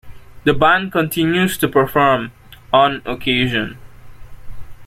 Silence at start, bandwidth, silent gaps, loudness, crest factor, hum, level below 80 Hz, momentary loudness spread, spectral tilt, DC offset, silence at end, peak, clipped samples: 0.05 s; 16.5 kHz; none; -16 LUFS; 16 dB; none; -40 dBFS; 8 LU; -5 dB/octave; under 0.1%; 0 s; 0 dBFS; under 0.1%